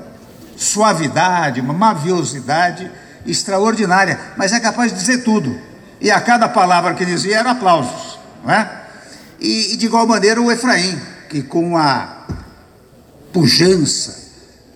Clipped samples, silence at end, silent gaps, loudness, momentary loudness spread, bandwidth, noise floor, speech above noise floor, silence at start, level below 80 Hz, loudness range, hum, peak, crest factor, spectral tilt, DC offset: under 0.1%; 0.5 s; none; -15 LUFS; 15 LU; 16 kHz; -45 dBFS; 30 dB; 0 s; -50 dBFS; 2 LU; none; -2 dBFS; 14 dB; -3.5 dB/octave; under 0.1%